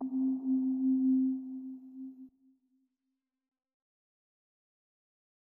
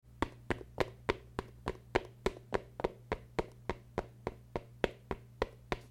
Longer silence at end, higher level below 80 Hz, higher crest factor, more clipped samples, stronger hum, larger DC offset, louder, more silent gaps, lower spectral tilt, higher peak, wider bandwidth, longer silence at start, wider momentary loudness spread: first, 3.25 s vs 0 s; second, under -90 dBFS vs -52 dBFS; second, 14 dB vs 28 dB; neither; neither; neither; first, -31 LUFS vs -40 LUFS; neither; first, -11.5 dB/octave vs -6 dB/octave; second, -22 dBFS vs -12 dBFS; second, 1.1 kHz vs 16.5 kHz; about the same, 0 s vs 0.05 s; first, 19 LU vs 8 LU